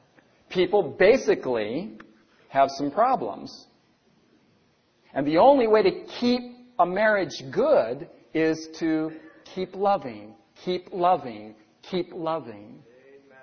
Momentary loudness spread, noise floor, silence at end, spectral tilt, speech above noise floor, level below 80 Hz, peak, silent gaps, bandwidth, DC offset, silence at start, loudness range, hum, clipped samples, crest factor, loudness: 19 LU; -64 dBFS; 0.65 s; -5.5 dB/octave; 41 dB; -62 dBFS; -6 dBFS; none; 6.6 kHz; under 0.1%; 0.5 s; 6 LU; none; under 0.1%; 20 dB; -24 LUFS